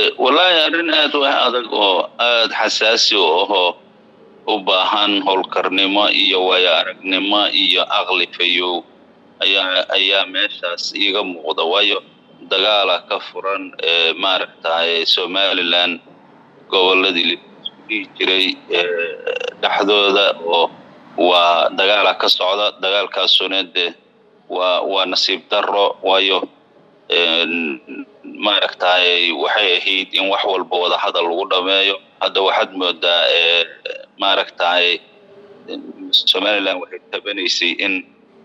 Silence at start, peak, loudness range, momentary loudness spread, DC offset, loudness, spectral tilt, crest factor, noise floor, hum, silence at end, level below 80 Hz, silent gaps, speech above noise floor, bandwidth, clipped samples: 0 s; -2 dBFS; 3 LU; 10 LU; under 0.1%; -15 LUFS; -1.5 dB/octave; 16 dB; -51 dBFS; none; 0.4 s; -80 dBFS; none; 34 dB; 13 kHz; under 0.1%